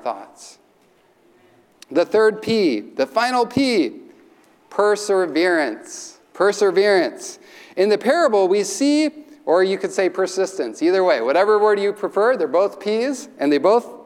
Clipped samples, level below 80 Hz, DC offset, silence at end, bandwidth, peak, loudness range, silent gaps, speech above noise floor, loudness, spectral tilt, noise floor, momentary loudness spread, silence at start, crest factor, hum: under 0.1%; -68 dBFS; under 0.1%; 0.05 s; 14 kHz; -4 dBFS; 2 LU; none; 38 dB; -19 LUFS; -4 dB/octave; -57 dBFS; 9 LU; 0.05 s; 14 dB; none